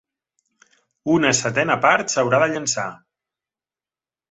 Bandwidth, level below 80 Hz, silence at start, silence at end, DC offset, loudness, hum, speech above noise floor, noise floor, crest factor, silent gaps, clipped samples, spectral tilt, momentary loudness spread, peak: 8.4 kHz; -62 dBFS; 1.05 s; 1.35 s; under 0.1%; -19 LUFS; none; over 71 dB; under -90 dBFS; 22 dB; none; under 0.1%; -3.5 dB/octave; 9 LU; 0 dBFS